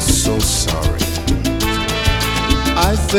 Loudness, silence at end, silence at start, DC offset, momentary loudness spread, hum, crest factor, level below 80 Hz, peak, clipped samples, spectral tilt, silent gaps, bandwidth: -16 LUFS; 0 s; 0 s; under 0.1%; 4 LU; none; 16 dB; -22 dBFS; 0 dBFS; under 0.1%; -3.5 dB/octave; none; 17.5 kHz